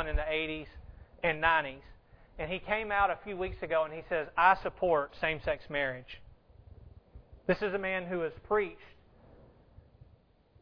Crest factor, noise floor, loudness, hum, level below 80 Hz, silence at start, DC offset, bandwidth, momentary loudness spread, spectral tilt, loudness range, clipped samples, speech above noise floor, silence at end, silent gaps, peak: 24 dB; -63 dBFS; -32 LUFS; none; -48 dBFS; 0 s; under 0.1%; 5.4 kHz; 15 LU; -7.5 dB/octave; 5 LU; under 0.1%; 31 dB; 1.7 s; none; -10 dBFS